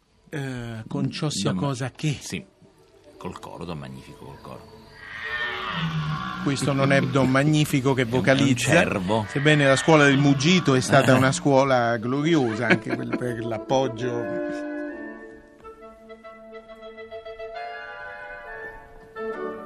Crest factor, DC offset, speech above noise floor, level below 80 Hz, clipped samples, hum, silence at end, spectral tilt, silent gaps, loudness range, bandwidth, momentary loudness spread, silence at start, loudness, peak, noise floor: 20 dB; under 0.1%; 32 dB; -54 dBFS; under 0.1%; none; 0 s; -5.5 dB/octave; none; 19 LU; 13.5 kHz; 22 LU; 0.3 s; -22 LUFS; -4 dBFS; -54 dBFS